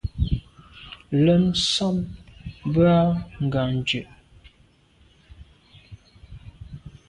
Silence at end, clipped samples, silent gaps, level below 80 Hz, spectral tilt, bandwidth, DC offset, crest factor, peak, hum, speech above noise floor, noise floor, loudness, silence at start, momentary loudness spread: 0.2 s; under 0.1%; none; -40 dBFS; -6 dB/octave; 11 kHz; under 0.1%; 18 dB; -8 dBFS; none; 37 dB; -58 dBFS; -22 LUFS; 0.05 s; 25 LU